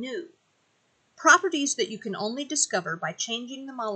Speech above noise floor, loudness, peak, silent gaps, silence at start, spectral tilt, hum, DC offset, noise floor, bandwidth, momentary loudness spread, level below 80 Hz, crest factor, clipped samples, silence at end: 42 dB; -25 LUFS; -4 dBFS; none; 0 s; -1.5 dB/octave; none; under 0.1%; -69 dBFS; 9.4 kHz; 15 LU; -88 dBFS; 24 dB; under 0.1%; 0 s